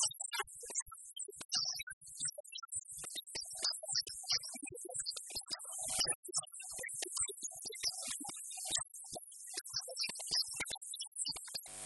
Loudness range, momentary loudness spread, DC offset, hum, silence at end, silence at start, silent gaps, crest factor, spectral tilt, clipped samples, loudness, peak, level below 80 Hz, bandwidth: 2 LU; 10 LU; under 0.1%; none; 0 s; 0 s; 0.82-0.86 s, 1.45-1.49 s, 1.83-1.87 s, 1.93-2.01 s, 2.40-2.44 s, 6.15-6.23 s, 11.07-11.12 s; 24 dB; 1 dB/octave; under 0.1%; -39 LUFS; -20 dBFS; -72 dBFS; 11.5 kHz